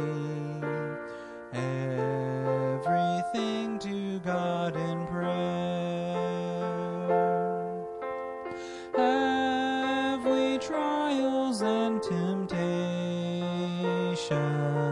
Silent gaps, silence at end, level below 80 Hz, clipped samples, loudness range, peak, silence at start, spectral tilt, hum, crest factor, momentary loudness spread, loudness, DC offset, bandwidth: none; 0 s; -66 dBFS; under 0.1%; 3 LU; -14 dBFS; 0 s; -6.5 dB/octave; none; 16 dB; 9 LU; -30 LUFS; under 0.1%; 11 kHz